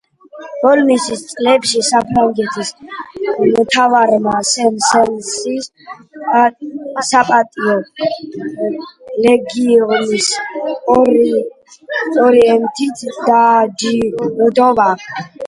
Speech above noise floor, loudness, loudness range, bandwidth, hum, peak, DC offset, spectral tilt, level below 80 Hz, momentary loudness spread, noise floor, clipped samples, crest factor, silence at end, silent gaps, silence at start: 22 dB; -13 LUFS; 3 LU; 11.5 kHz; none; 0 dBFS; under 0.1%; -3.5 dB/octave; -52 dBFS; 13 LU; -35 dBFS; under 0.1%; 14 dB; 0 s; none; 0.35 s